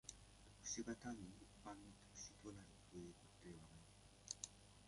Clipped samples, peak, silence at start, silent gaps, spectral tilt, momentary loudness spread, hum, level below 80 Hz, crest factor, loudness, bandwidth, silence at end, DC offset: under 0.1%; -30 dBFS; 0.05 s; none; -3 dB/octave; 15 LU; 50 Hz at -70 dBFS; -72 dBFS; 26 dB; -56 LUFS; 11.5 kHz; 0 s; under 0.1%